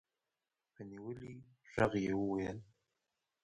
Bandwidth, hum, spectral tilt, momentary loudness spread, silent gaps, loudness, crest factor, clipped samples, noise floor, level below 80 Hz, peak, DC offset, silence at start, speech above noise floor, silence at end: 10 kHz; none; -7 dB/octave; 19 LU; none; -39 LUFS; 24 dB; under 0.1%; under -90 dBFS; -64 dBFS; -16 dBFS; under 0.1%; 0.8 s; over 52 dB; 0.8 s